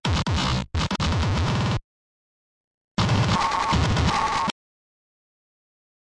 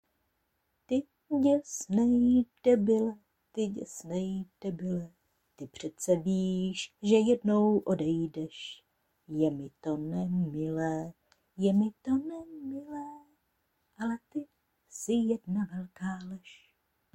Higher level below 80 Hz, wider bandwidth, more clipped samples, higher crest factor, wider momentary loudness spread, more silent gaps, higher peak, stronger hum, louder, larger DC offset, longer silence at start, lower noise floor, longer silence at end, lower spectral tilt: first, -36 dBFS vs -64 dBFS; second, 11.5 kHz vs 15 kHz; neither; second, 14 dB vs 20 dB; second, 6 LU vs 16 LU; first, 1.84-2.95 s vs none; about the same, -12 dBFS vs -12 dBFS; neither; first, -23 LUFS vs -31 LUFS; neither; second, 0.05 s vs 0.9 s; first, under -90 dBFS vs -78 dBFS; first, 1.5 s vs 0.6 s; second, -5 dB/octave vs -6.5 dB/octave